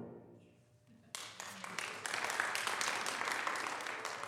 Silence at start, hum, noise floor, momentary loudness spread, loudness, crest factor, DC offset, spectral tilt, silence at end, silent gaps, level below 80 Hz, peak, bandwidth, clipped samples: 0 s; none; -65 dBFS; 11 LU; -39 LUFS; 28 dB; under 0.1%; -0.5 dB/octave; 0 s; none; -84 dBFS; -14 dBFS; 16 kHz; under 0.1%